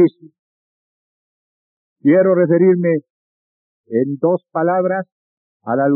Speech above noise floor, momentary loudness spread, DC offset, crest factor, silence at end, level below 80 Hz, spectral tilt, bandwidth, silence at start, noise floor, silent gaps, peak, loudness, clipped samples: over 75 dB; 10 LU; under 0.1%; 14 dB; 0 s; -90 dBFS; -9.5 dB/octave; 3.9 kHz; 0 s; under -90 dBFS; 0.39-1.96 s, 3.10-3.84 s, 5.12-5.60 s; -4 dBFS; -16 LUFS; under 0.1%